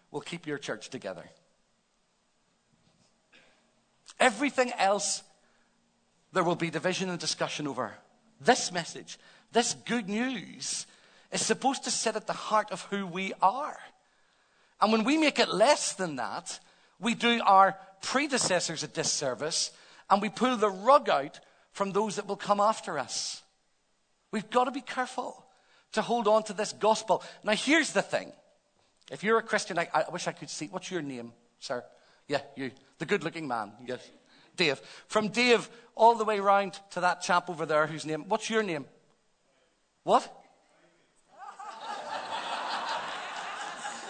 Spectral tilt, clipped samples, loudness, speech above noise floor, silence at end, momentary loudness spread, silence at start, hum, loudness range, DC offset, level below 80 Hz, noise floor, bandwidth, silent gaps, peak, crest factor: -3 dB/octave; under 0.1%; -29 LUFS; 43 dB; 0 s; 16 LU; 0.15 s; none; 9 LU; under 0.1%; -78 dBFS; -72 dBFS; 9.4 kHz; none; -6 dBFS; 24 dB